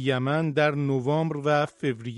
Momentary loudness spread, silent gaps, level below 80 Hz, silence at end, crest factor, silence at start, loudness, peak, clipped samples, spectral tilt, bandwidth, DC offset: 3 LU; none; -66 dBFS; 0 s; 16 dB; 0 s; -25 LUFS; -8 dBFS; under 0.1%; -7 dB/octave; 11 kHz; under 0.1%